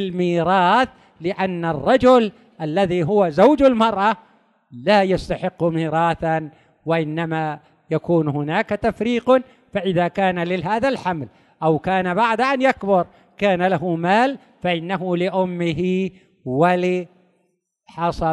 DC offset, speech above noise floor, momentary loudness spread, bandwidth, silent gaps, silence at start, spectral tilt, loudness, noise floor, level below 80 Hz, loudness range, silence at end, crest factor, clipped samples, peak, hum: under 0.1%; 50 dB; 11 LU; 10.5 kHz; none; 0 s; -7 dB/octave; -19 LUFS; -69 dBFS; -48 dBFS; 5 LU; 0 s; 16 dB; under 0.1%; -2 dBFS; none